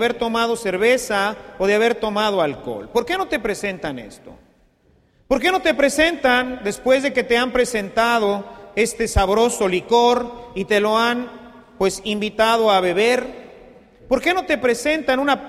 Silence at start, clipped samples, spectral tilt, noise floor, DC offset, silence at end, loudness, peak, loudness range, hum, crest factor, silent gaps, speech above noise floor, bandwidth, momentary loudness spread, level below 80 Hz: 0 s; under 0.1%; -3.5 dB/octave; -58 dBFS; under 0.1%; 0 s; -19 LUFS; -2 dBFS; 4 LU; none; 16 dB; none; 39 dB; 15 kHz; 9 LU; -40 dBFS